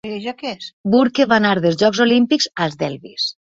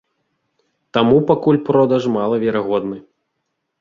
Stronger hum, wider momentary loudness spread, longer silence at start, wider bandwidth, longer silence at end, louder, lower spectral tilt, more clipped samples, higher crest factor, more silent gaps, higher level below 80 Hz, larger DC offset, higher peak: neither; first, 12 LU vs 8 LU; second, 0.05 s vs 0.95 s; about the same, 7.8 kHz vs 7.2 kHz; second, 0.15 s vs 0.8 s; about the same, -17 LUFS vs -16 LUFS; second, -5 dB/octave vs -8 dB/octave; neither; about the same, 16 dB vs 18 dB; first, 0.73-0.84 s vs none; about the same, -58 dBFS vs -54 dBFS; neither; about the same, -2 dBFS vs 0 dBFS